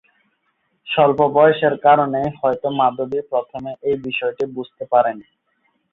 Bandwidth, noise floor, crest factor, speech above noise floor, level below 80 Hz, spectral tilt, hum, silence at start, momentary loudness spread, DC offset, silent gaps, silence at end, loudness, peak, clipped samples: 4.2 kHz; -68 dBFS; 18 dB; 50 dB; -58 dBFS; -8 dB/octave; none; 0.85 s; 12 LU; under 0.1%; none; 0.7 s; -18 LUFS; -2 dBFS; under 0.1%